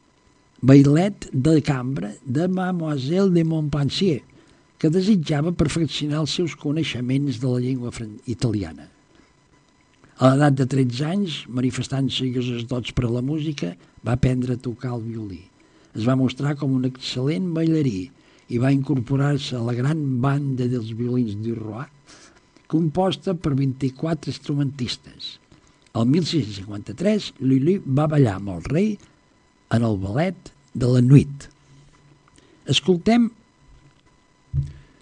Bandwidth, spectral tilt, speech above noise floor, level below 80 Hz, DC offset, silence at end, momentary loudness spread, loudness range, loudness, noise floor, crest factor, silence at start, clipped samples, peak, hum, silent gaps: 10 kHz; -7 dB/octave; 38 dB; -48 dBFS; under 0.1%; 0.25 s; 12 LU; 4 LU; -22 LUFS; -58 dBFS; 22 dB; 0.6 s; under 0.1%; 0 dBFS; none; none